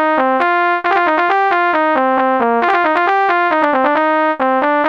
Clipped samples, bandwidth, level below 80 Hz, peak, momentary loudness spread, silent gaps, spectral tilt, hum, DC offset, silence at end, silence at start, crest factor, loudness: under 0.1%; 7.2 kHz; -62 dBFS; 0 dBFS; 1 LU; none; -5 dB/octave; none; 0.2%; 0 s; 0 s; 14 dB; -13 LUFS